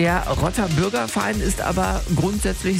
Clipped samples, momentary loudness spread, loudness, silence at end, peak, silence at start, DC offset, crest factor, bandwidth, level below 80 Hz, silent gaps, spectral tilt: under 0.1%; 2 LU; -21 LUFS; 0 s; -8 dBFS; 0 s; under 0.1%; 14 dB; 16 kHz; -30 dBFS; none; -5 dB/octave